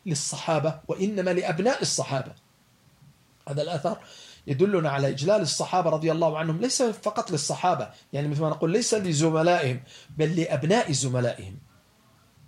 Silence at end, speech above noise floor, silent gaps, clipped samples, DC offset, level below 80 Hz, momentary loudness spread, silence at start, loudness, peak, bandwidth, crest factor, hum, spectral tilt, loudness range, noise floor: 0.9 s; 35 dB; none; under 0.1%; under 0.1%; -66 dBFS; 9 LU; 0.05 s; -25 LUFS; -10 dBFS; 14.5 kHz; 16 dB; none; -4.5 dB/octave; 4 LU; -60 dBFS